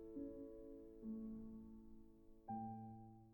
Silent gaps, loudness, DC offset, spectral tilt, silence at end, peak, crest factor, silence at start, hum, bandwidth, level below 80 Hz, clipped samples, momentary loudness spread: none; -54 LUFS; under 0.1%; -10.5 dB/octave; 0 s; -38 dBFS; 16 dB; 0 s; none; 19 kHz; -68 dBFS; under 0.1%; 13 LU